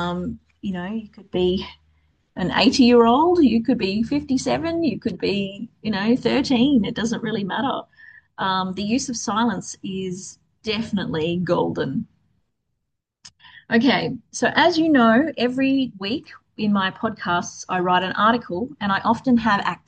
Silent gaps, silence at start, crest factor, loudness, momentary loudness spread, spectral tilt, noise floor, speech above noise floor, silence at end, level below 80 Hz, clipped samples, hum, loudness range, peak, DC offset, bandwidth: none; 0 s; 18 dB; -21 LUFS; 14 LU; -5 dB/octave; -78 dBFS; 58 dB; 0.1 s; -54 dBFS; under 0.1%; none; 7 LU; -2 dBFS; under 0.1%; 9 kHz